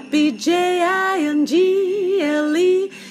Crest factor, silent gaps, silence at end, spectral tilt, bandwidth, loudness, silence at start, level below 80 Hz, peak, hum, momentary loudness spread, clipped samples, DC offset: 12 dB; none; 0 s; -3.5 dB/octave; 15 kHz; -18 LUFS; 0 s; -78 dBFS; -6 dBFS; none; 3 LU; under 0.1%; under 0.1%